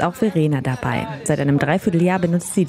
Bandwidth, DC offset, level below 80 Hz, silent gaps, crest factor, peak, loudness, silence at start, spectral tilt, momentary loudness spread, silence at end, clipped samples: 15.5 kHz; under 0.1%; -50 dBFS; none; 14 dB; -6 dBFS; -19 LUFS; 0 s; -6.5 dB/octave; 5 LU; 0 s; under 0.1%